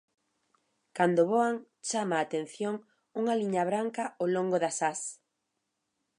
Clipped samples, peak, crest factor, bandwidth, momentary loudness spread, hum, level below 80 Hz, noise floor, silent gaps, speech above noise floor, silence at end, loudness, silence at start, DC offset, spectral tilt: under 0.1%; -10 dBFS; 20 dB; 11.5 kHz; 11 LU; none; -84 dBFS; -82 dBFS; none; 53 dB; 1.05 s; -30 LUFS; 0.95 s; under 0.1%; -4.5 dB/octave